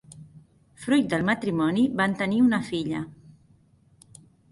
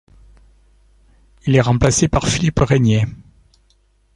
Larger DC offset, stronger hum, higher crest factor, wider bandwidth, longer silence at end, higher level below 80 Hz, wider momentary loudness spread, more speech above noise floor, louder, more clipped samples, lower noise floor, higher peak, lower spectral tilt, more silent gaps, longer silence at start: neither; neither; about the same, 16 dB vs 18 dB; about the same, 11.5 kHz vs 11.5 kHz; first, 1.35 s vs 1 s; second, -60 dBFS vs -34 dBFS; first, 11 LU vs 6 LU; second, 36 dB vs 43 dB; second, -24 LUFS vs -16 LUFS; neither; about the same, -59 dBFS vs -57 dBFS; second, -10 dBFS vs 0 dBFS; about the same, -6 dB/octave vs -5.5 dB/octave; neither; second, 0.1 s vs 1.45 s